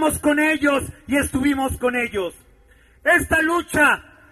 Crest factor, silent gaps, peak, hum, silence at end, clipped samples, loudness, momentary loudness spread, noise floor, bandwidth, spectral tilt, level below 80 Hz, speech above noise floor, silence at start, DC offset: 16 dB; none; -4 dBFS; none; 0.3 s; under 0.1%; -19 LUFS; 8 LU; -53 dBFS; 13.5 kHz; -4 dB/octave; -40 dBFS; 33 dB; 0 s; under 0.1%